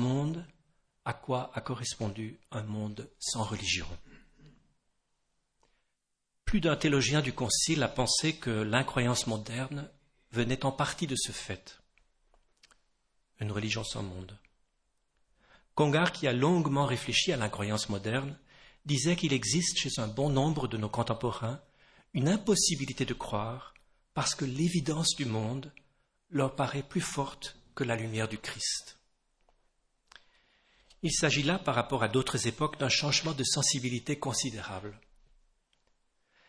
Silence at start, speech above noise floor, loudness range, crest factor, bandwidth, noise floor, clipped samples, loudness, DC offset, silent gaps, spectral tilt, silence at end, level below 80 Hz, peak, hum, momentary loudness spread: 0 s; 50 dB; 8 LU; 24 dB; 11 kHz; -81 dBFS; under 0.1%; -31 LUFS; under 0.1%; none; -4 dB/octave; 1.5 s; -54 dBFS; -8 dBFS; none; 14 LU